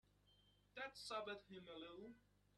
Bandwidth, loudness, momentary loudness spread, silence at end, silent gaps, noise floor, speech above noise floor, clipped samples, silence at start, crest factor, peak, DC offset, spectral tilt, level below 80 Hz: 12 kHz; -54 LUFS; 12 LU; 0.35 s; none; -76 dBFS; 22 dB; under 0.1%; 0.25 s; 22 dB; -34 dBFS; under 0.1%; -3 dB/octave; -82 dBFS